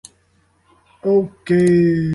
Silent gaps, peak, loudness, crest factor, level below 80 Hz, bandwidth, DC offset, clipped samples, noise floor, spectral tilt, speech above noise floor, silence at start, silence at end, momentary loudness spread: none; -6 dBFS; -16 LUFS; 12 dB; -50 dBFS; 11.5 kHz; under 0.1%; under 0.1%; -59 dBFS; -8 dB/octave; 44 dB; 1.05 s; 0 s; 5 LU